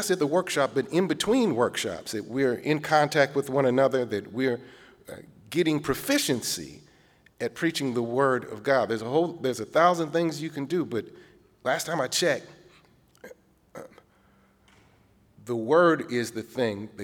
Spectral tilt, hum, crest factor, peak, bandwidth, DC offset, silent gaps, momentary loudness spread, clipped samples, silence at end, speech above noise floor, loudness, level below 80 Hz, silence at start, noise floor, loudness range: -4.5 dB/octave; none; 20 dB; -6 dBFS; 19.5 kHz; under 0.1%; none; 12 LU; under 0.1%; 0 s; 36 dB; -26 LUFS; -64 dBFS; 0 s; -61 dBFS; 6 LU